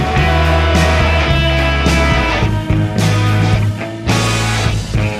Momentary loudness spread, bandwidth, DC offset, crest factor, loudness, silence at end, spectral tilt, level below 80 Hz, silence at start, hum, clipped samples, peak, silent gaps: 4 LU; 14 kHz; under 0.1%; 12 dB; -14 LUFS; 0 s; -5.5 dB/octave; -20 dBFS; 0 s; none; under 0.1%; 0 dBFS; none